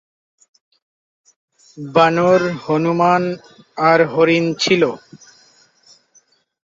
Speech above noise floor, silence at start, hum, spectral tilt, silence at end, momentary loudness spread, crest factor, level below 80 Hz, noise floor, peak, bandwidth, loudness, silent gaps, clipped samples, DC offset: 41 dB; 1.75 s; none; -5.5 dB/octave; 1.6 s; 16 LU; 18 dB; -62 dBFS; -57 dBFS; -2 dBFS; 7.8 kHz; -15 LUFS; none; under 0.1%; under 0.1%